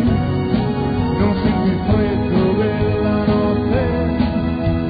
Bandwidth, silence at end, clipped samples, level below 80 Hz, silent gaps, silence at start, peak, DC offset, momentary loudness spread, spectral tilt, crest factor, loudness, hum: 5 kHz; 0 s; under 0.1%; -30 dBFS; none; 0 s; -4 dBFS; under 0.1%; 2 LU; -12 dB/octave; 12 dB; -18 LUFS; none